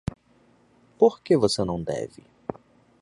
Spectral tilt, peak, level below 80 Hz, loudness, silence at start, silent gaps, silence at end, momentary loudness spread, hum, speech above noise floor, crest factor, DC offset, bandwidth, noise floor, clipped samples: -6 dB/octave; -4 dBFS; -52 dBFS; -23 LUFS; 1 s; none; 0.5 s; 17 LU; none; 37 dB; 22 dB; under 0.1%; 11.5 kHz; -60 dBFS; under 0.1%